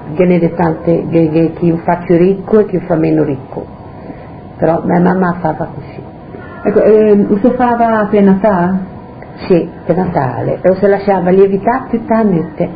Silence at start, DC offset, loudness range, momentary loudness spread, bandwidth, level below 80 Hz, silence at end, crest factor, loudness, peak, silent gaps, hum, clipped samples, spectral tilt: 0 s; under 0.1%; 4 LU; 20 LU; 5 kHz; -40 dBFS; 0 s; 12 dB; -12 LUFS; 0 dBFS; none; none; 0.2%; -12 dB/octave